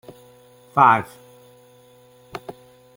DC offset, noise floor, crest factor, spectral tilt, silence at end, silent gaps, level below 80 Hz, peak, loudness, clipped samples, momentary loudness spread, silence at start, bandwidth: under 0.1%; -51 dBFS; 22 dB; -6 dB/octave; 0.45 s; none; -64 dBFS; -2 dBFS; -17 LUFS; under 0.1%; 24 LU; 0.75 s; 17 kHz